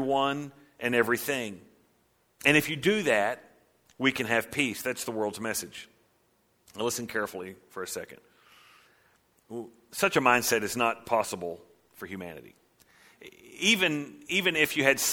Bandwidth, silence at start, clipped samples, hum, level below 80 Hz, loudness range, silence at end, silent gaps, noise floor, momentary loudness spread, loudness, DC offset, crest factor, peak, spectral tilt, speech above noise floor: 19 kHz; 0 s; under 0.1%; none; -68 dBFS; 10 LU; 0 s; none; -69 dBFS; 19 LU; -27 LUFS; under 0.1%; 26 dB; -4 dBFS; -3 dB/octave; 40 dB